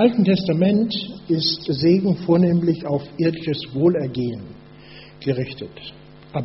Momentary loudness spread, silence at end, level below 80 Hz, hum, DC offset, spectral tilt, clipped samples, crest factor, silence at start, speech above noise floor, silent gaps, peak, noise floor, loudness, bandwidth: 15 LU; 0 s; -54 dBFS; none; under 0.1%; -6.5 dB/octave; under 0.1%; 16 dB; 0 s; 23 dB; none; -4 dBFS; -43 dBFS; -20 LUFS; 6 kHz